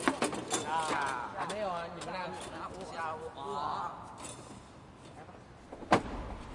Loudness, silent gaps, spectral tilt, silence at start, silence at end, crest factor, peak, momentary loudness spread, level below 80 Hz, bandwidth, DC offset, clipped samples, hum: -36 LUFS; none; -3.5 dB/octave; 0 s; 0 s; 26 dB; -10 dBFS; 20 LU; -56 dBFS; 11.5 kHz; under 0.1%; under 0.1%; none